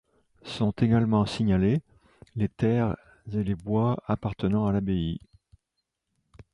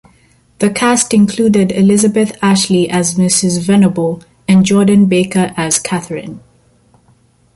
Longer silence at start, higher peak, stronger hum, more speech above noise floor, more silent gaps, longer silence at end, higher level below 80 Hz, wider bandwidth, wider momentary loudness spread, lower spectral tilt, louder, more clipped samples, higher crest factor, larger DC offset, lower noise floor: second, 0.45 s vs 0.6 s; second, -10 dBFS vs 0 dBFS; neither; first, 56 dB vs 40 dB; neither; second, 0.1 s vs 1.15 s; about the same, -48 dBFS vs -48 dBFS; about the same, 11 kHz vs 11.5 kHz; about the same, 12 LU vs 10 LU; first, -8.5 dB/octave vs -5 dB/octave; second, -27 LUFS vs -12 LUFS; neither; about the same, 16 dB vs 12 dB; neither; first, -82 dBFS vs -51 dBFS